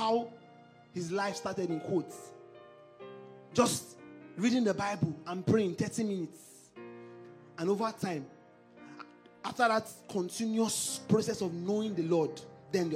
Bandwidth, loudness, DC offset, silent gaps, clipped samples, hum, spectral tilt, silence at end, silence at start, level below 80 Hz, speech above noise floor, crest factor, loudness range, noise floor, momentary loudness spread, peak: 16 kHz; -33 LUFS; under 0.1%; none; under 0.1%; none; -5 dB/octave; 0 s; 0 s; -72 dBFS; 25 dB; 22 dB; 6 LU; -57 dBFS; 22 LU; -12 dBFS